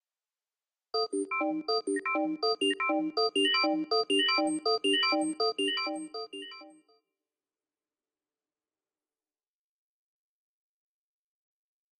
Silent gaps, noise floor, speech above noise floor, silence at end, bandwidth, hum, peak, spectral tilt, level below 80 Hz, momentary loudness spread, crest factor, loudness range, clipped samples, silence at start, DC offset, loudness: none; under -90 dBFS; over 60 dB; 5.3 s; 9.4 kHz; none; -16 dBFS; -1.5 dB/octave; -88 dBFS; 13 LU; 18 dB; 11 LU; under 0.1%; 0.95 s; under 0.1%; -28 LUFS